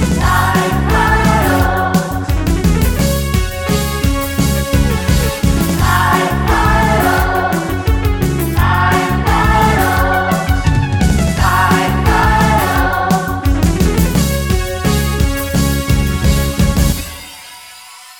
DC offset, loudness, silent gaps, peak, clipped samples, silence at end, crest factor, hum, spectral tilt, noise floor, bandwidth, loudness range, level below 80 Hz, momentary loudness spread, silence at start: 0.2%; -14 LUFS; none; 0 dBFS; under 0.1%; 0.05 s; 12 dB; none; -5.5 dB/octave; -36 dBFS; 18 kHz; 2 LU; -18 dBFS; 5 LU; 0 s